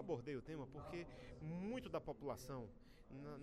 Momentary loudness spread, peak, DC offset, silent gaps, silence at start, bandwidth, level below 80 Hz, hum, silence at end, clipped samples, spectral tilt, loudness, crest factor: 10 LU; -34 dBFS; under 0.1%; none; 0 s; 13 kHz; -64 dBFS; none; 0 s; under 0.1%; -6.5 dB/octave; -50 LUFS; 16 dB